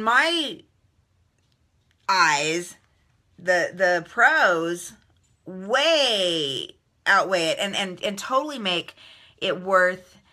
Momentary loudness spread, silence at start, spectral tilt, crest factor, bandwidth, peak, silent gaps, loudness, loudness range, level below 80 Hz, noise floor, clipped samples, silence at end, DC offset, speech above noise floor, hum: 16 LU; 0 s; -2.5 dB/octave; 20 dB; 14.5 kHz; -6 dBFS; none; -22 LUFS; 3 LU; -70 dBFS; -66 dBFS; under 0.1%; 0.3 s; under 0.1%; 43 dB; none